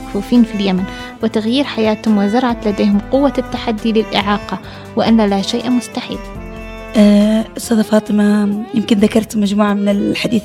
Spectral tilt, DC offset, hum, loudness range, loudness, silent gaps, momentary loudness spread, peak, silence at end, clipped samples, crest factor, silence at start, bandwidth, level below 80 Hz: -6 dB/octave; under 0.1%; none; 3 LU; -15 LUFS; none; 11 LU; 0 dBFS; 0 s; under 0.1%; 14 dB; 0 s; 13.5 kHz; -38 dBFS